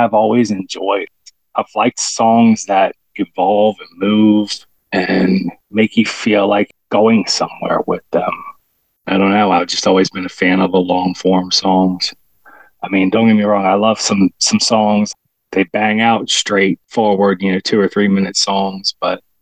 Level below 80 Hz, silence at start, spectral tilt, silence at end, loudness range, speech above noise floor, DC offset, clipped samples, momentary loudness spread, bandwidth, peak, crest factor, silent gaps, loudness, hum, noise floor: -54 dBFS; 0 s; -4.5 dB/octave; 0.25 s; 2 LU; 47 dB; 0.2%; under 0.1%; 9 LU; 9.8 kHz; 0 dBFS; 14 dB; none; -14 LUFS; none; -61 dBFS